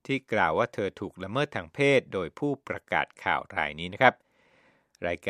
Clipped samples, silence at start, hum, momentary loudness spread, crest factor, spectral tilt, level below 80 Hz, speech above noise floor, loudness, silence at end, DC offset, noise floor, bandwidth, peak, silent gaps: under 0.1%; 0.1 s; none; 10 LU; 26 dB; -5.5 dB/octave; -62 dBFS; 36 dB; -28 LUFS; 0 s; under 0.1%; -64 dBFS; 12 kHz; -2 dBFS; none